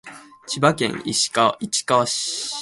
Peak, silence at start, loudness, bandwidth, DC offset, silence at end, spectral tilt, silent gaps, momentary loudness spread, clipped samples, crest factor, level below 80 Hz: -2 dBFS; 0.05 s; -20 LUFS; 12 kHz; under 0.1%; 0 s; -3 dB/octave; none; 6 LU; under 0.1%; 20 dB; -60 dBFS